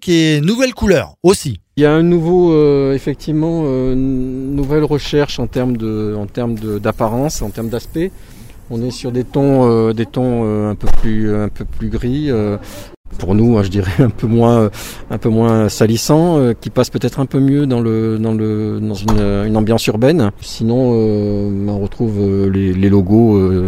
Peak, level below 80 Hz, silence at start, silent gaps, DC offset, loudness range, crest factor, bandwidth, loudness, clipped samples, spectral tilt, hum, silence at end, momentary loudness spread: 0 dBFS; -28 dBFS; 0 s; 12.97-13.04 s; under 0.1%; 5 LU; 14 dB; 16 kHz; -15 LUFS; under 0.1%; -7 dB/octave; none; 0 s; 9 LU